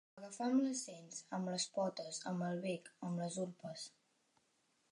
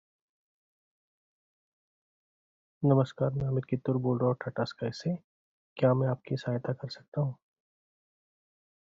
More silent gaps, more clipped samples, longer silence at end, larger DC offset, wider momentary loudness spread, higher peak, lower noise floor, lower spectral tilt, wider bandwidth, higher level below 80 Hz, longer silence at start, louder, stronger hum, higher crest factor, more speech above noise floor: second, none vs 5.24-5.76 s, 7.08-7.12 s; neither; second, 1 s vs 1.5 s; neither; first, 13 LU vs 10 LU; second, -24 dBFS vs -12 dBFS; second, -79 dBFS vs under -90 dBFS; second, -4.5 dB/octave vs -7.5 dB/octave; first, 11.5 kHz vs 7.4 kHz; second, under -90 dBFS vs -64 dBFS; second, 0.15 s vs 2.8 s; second, -42 LUFS vs -31 LUFS; neither; about the same, 18 dB vs 22 dB; second, 38 dB vs over 60 dB